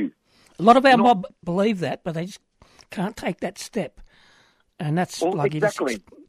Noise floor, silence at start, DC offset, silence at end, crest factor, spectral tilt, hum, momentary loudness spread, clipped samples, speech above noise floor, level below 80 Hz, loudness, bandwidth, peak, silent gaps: -59 dBFS; 0 s; under 0.1%; 0.3 s; 20 dB; -5.5 dB/octave; none; 16 LU; under 0.1%; 38 dB; -58 dBFS; -22 LUFS; 15 kHz; -2 dBFS; none